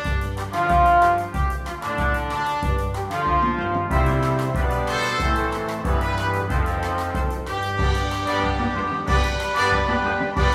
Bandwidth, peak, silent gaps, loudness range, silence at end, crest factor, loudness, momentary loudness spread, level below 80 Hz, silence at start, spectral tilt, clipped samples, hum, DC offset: 14.5 kHz; -4 dBFS; none; 2 LU; 0 s; 16 dB; -22 LUFS; 6 LU; -28 dBFS; 0 s; -5.5 dB/octave; under 0.1%; none; under 0.1%